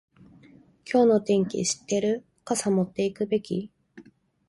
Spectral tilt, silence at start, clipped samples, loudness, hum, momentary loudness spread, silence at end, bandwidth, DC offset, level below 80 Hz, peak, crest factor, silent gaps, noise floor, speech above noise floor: -5 dB/octave; 0.85 s; under 0.1%; -25 LUFS; none; 12 LU; 0.5 s; 11.5 kHz; under 0.1%; -66 dBFS; -8 dBFS; 18 dB; none; -54 dBFS; 30 dB